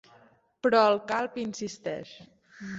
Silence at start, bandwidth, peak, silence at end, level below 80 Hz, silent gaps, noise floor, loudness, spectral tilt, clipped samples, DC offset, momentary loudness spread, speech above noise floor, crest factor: 0.65 s; 8 kHz; -8 dBFS; 0 s; -70 dBFS; none; -60 dBFS; -27 LUFS; -4.5 dB/octave; under 0.1%; under 0.1%; 18 LU; 33 dB; 20 dB